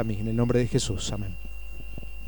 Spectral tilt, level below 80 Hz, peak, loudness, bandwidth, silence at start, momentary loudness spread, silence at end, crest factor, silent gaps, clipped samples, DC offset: -5.5 dB/octave; -38 dBFS; -10 dBFS; -27 LUFS; 18 kHz; 0 s; 17 LU; 0 s; 18 dB; none; under 0.1%; 2%